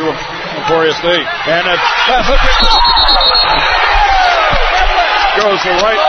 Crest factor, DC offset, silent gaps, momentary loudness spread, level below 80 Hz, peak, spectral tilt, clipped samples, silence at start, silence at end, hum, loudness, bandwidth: 10 dB; under 0.1%; none; 6 LU; -20 dBFS; 0 dBFS; -3 dB/octave; under 0.1%; 0 s; 0 s; none; -10 LUFS; 6.6 kHz